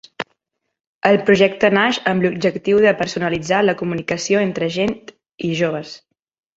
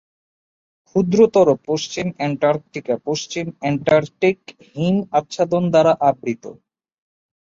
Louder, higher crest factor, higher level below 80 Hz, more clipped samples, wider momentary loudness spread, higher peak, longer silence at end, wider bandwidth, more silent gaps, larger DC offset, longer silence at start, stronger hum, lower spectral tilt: about the same, -17 LUFS vs -19 LUFS; about the same, 18 dB vs 18 dB; about the same, -54 dBFS vs -58 dBFS; neither; about the same, 14 LU vs 12 LU; about the same, -2 dBFS vs -2 dBFS; second, 0.6 s vs 0.95 s; about the same, 8 kHz vs 7.6 kHz; first, 0.87-1.01 s vs none; neither; second, 0.2 s vs 0.95 s; neither; about the same, -5 dB/octave vs -6 dB/octave